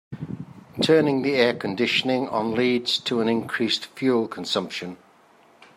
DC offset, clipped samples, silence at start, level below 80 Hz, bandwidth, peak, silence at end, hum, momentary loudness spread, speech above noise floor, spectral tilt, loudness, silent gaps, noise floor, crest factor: under 0.1%; under 0.1%; 0.1 s; -66 dBFS; 15.5 kHz; -4 dBFS; 0.8 s; none; 16 LU; 33 dB; -5 dB/octave; -23 LUFS; none; -55 dBFS; 20 dB